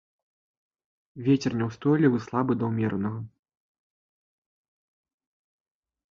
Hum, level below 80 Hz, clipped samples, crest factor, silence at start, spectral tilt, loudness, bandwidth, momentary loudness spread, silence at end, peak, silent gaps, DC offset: none; -62 dBFS; under 0.1%; 22 dB; 1.15 s; -8 dB/octave; -26 LUFS; 7.2 kHz; 10 LU; 2.85 s; -8 dBFS; none; under 0.1%